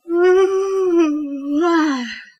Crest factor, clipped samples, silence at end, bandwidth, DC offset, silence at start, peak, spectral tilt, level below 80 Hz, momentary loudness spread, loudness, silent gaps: 12 dB; under 0.1%; 0.15 s; 9.2 kHz; under 0.1%; 0.05 s; -4 dBFS; -3.5 dB/octave; -62 dBFS; 9 LU; -17 LUFS; none